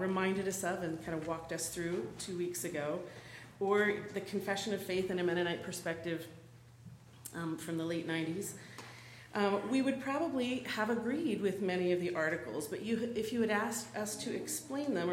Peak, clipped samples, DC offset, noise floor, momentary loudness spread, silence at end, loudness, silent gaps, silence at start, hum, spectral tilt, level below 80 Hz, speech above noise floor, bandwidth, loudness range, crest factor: -18 dBFS; under 0.1%; under 0.1%; -56 dBFS; 14 LU; 0 s; -36 LUFS; none; 0 s; none; -4.5 dB/octave; -70 dBFS; 20 dB; 16 kHz; 5 LU; 18 dB